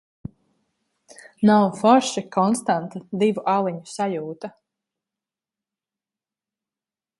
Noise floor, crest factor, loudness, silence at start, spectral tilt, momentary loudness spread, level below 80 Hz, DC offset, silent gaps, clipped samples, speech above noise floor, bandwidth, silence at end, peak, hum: under -90 dBFS; 22 dB; -21 LUFS; 1.4 s; -5.5 dB/octave; 20 LU; -64 dBFS; under 0.1%; none; under 0.1%; over 69 dB; 11.5 kHz; 2.7 s; -2 dBFS; none